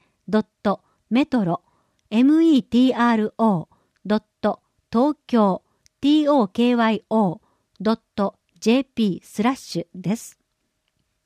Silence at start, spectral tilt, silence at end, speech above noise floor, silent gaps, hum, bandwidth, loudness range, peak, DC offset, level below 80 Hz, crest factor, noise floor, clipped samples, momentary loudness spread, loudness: 0.3 s; -6.5 dB/octave; 0.95 s; 54 dB; none; none; 13.5 kHz; 5 LU; -8 dBFS; under 0.1%; -62 dBFS; 14 dB; -73 dBFS; under 0.1%; 11 LU; -21 LUFS